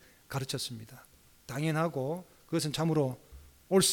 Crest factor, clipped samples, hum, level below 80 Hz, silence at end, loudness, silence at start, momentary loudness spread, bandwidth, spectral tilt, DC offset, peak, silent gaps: 18 dB; under 0.1%; none; -62 dBFS; 0 s; -33 LUFS; 0.3 s; 12 LU; 19 kHz; -4.5 dB/octave; under 0.1%; -14 dBFS; none